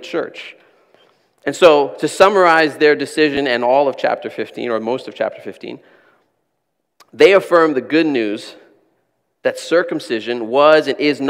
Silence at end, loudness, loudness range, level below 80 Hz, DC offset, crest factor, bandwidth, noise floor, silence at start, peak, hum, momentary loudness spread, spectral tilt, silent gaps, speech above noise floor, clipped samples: 0 s; -15 LUFS; 7 LU; -62 dBFS; under 0.1%; 16 dB; 15 kHz; -73 dBFS; 0 s; 0 dBFS; none; 17 LU; -4.5 dB/octave; none; 57 dB; 0.2%